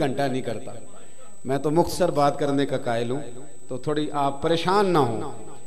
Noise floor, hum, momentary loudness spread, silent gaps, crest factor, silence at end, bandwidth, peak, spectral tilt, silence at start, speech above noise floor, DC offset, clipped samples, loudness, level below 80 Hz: -49 dBFS; none; 16 LU; none; 18 dB; 0.1 s; 14.5 kHz; -6 dBFS; -6 dB/octave; 0 s; 24 dB; 3%; under 0.1%; -24 LUFS; -54 dBFS